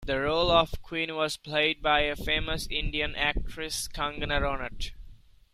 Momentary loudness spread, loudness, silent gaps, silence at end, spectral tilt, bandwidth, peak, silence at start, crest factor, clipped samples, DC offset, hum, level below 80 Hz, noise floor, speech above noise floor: 10 LU; -28 LUFS; none; 0.4 s; -3.5 dB/octave; 15 kHz; -8 dBFS; 0 s; 22 dB; under 0.1%; under 0.1%; none; -38 dBFS; -50 dBFS; 21 dB